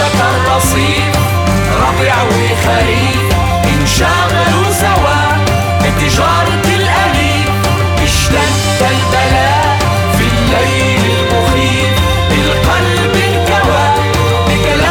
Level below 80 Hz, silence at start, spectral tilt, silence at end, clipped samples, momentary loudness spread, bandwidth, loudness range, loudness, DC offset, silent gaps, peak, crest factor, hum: -22 dBFS; 0 s; -4.5 dB/octave; 0 s; under 0.1%; 2 LU; 19 kHz; 0 LU; -11 LUFS; under 0.1%; none; 0 dBFS; 10 dB; none